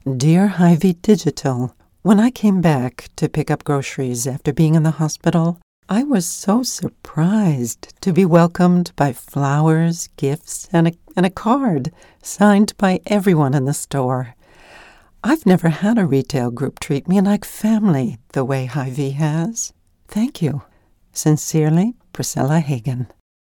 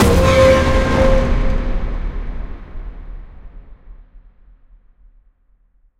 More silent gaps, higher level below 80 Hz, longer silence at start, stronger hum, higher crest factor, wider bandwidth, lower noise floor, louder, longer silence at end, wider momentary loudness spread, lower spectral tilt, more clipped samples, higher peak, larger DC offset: first, 5.63-5.83 s vs none; second, -50 dBFS vs -22 dBFS; about the same, 0.05 s vs 0 s; neither; about the same, 16 dB vs 16 dB; first, 18 kHz vs 16 kHz; second, -45 dBFS vs -55 dBFS; second, -18 LUFS vs -15 LUFS; second, 0.35 s vs 1.8 s; second, 11 LU vs 25 LU; about the same, -6.5 dB/octave vs -6 dB/octave; neither; about the same, -2 dBFS vs 0 dBFS; neither